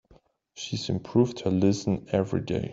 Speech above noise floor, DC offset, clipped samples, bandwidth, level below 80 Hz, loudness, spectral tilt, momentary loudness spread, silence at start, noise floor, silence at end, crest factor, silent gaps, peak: 34 dB; under 0.1%; under 0.1%; 7.8 kHz; -56 dBFS; -27 LUFS; -6.5 dB/octave; 8 LU; 0.55 s; -60 dBFS; 0 s; 18 dB; none; -8 dBFS